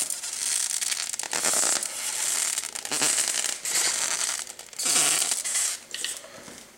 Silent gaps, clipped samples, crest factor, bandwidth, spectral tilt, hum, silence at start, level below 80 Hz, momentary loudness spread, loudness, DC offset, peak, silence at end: none; under 0.1%; 20 dB; 17 kHz; 1.5 dB/octave; none; 0 s; -72 dBFS; 10 LU; -24 LUFS; under 0.1%; -8 dBFS; 0 s